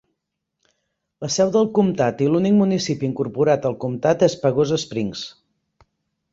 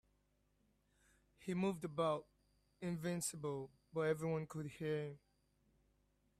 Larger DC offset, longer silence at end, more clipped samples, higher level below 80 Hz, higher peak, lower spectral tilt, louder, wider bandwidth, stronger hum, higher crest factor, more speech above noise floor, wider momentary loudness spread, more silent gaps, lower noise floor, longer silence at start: neither; second, 1.05 s vs 1.2 s; neither; first, -58 dBFS vs -76 dBFS; first, -2 dBFS vs -26 dBFS; about the same, -6 dB/octave vs -5.5 dB/octave; first, -20 LUFS vs -43 LUFS; second, 7.8 kHz vs 15 kHz; second, none vs 50 Hz at -70 dBFS; about the same, 18 dB vs 18 dB; first, 60 dB vs 38 dB; about the same, 9 LU vs 10 LU; neither; about the same, -79 dBFS vs -79 dBFS; second, 1.2 s vs 1.4 s